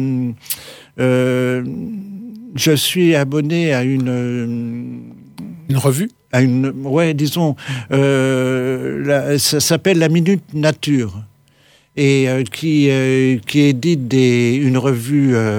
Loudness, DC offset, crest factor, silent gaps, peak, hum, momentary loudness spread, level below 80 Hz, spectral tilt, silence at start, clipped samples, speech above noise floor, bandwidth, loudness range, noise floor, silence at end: -16 LUFS; under 0.1%; 14 dB; none; -2 dBFS; none; 13 LU; -58 dBFS; -5.5 dB/octave; 0 s; under 0.1%; 37 dB; 20 kHz; 4 LU; -52 dBFS; 0 s